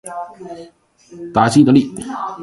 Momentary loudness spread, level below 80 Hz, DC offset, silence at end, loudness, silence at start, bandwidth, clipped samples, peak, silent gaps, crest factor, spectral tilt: 23 LU; -52 dBFS; under 0.1%; 0 s; -14 LUFS; 0.05 s; 11.5 kHz; under 0.1%; 0 dBFS; none; 16 dB; -6 dB/octave